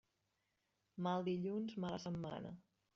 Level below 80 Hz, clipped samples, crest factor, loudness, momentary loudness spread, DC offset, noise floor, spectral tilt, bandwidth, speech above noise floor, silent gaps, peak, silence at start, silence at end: -76 dBFS; under 0.1%; 18 dB; -43 LUFS; 14 LU; under 0.1%; -86 dBFS; -6.5 dB/octave; 7.2 kHz; 43 dB; none; -28 dBFS; 0.95 s; 0.35 s